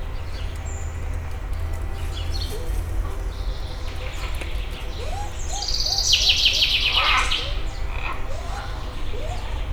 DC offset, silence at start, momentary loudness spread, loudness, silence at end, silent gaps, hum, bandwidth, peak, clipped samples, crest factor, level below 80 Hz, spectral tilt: under 0.1%; 0 s; 16 LU; -24 LUFS; 0 s; none; none; 18 kHz; -4 dBFS; under 0.1%; 20 dB; -28 dBFS; -2 dB/octave